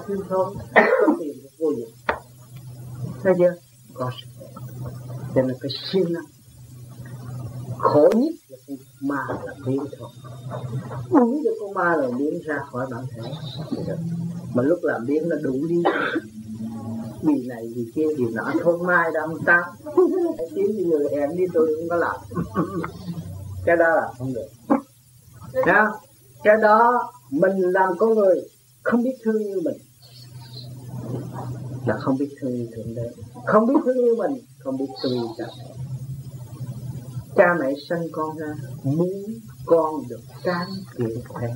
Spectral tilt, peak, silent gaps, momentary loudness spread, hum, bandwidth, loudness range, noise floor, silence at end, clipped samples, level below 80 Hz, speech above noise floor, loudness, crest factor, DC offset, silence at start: -7 dB/octave; 0 dBFS; none; 17 LU; none; 16 kHz; 8 LU; -51 dBFS; 0 s; under 0.1%; -58 dBFS; 29 dB; -23 LUFS; 22 dB; under 0.1%; 0 s